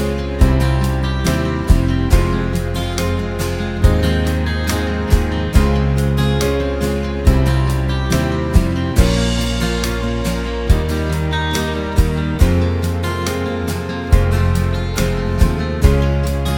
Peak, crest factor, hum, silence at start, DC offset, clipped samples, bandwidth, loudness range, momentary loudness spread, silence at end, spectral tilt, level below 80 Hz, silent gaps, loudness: 0 dBFS; 16 dB; none; 0 s; under 0.1%; under 0.1%; 18 kHz; 1 LU; 5 LU; 0 s; -6 dB/octave; -20 dBFS; none; -17 LUFS